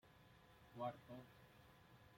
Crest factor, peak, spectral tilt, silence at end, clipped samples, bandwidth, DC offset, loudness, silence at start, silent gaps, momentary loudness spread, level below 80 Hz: 24 dB; -34 dBFS; -6.5 dB/octave; 0 s; under 0.1%; 16.5 kHz; under 0.1%; -54 LUFS; 0.05 s; none; 17 LU; -80 dBFS